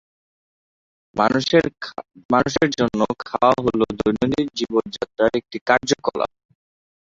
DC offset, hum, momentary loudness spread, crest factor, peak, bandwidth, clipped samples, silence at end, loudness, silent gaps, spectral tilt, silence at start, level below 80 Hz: under 0.1%; none; 11 LU; 20 dB; -2 dBFS; 7.8 kHz; under 0.1%; 0.8 s; -20 LUFS; 2.25-2.29 s, 5.61-5.66 s; -5 dB/octave; 1.15 s; -50 dBFS